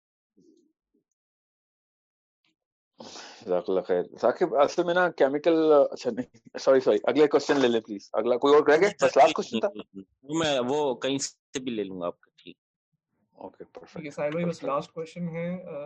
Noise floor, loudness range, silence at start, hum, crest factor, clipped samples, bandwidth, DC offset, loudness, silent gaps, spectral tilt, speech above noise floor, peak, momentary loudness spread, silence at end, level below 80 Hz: -45 dBFS; 12 LU; 3 s; none; 18 dB; under 0.1%; 9 kHz; under 0.1%; -25 LUFS; 11.39-11.53 s, 12.58-12.92 s; -4.5 dB/octave; 20 dB; -8 dBFS; 18 LU; 0 s; -72 dBFS